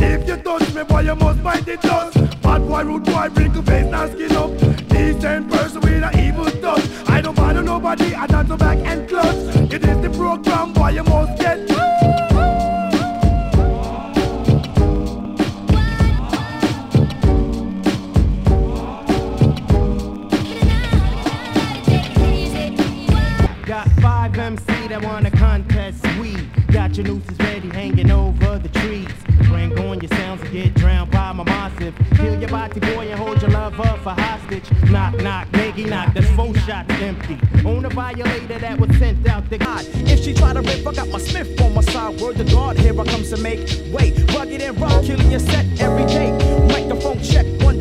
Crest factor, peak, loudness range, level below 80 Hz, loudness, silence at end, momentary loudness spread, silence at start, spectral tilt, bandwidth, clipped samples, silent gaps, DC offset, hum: 16 dB; 0 dBFS; 2 LU; -20 dBFS; -18 LUFS; 0 s; 7 LU; 0 s; -7 dB/octave; 13.5 kHz; under 0.1%; none; under 0.1%; none